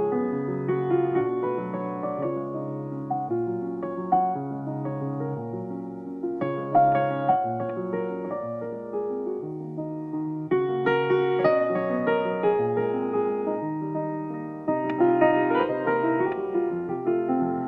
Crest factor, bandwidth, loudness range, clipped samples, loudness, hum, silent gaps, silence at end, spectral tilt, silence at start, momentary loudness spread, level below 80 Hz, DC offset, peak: 18 dB; 4.7 kHz; 5 LU; under 0.1%; -26 LUFS; none; none; 0 s; -10 dB/octave; 0 s; 10 LU; -66 dBFS; under 0.1%; -8 dBFS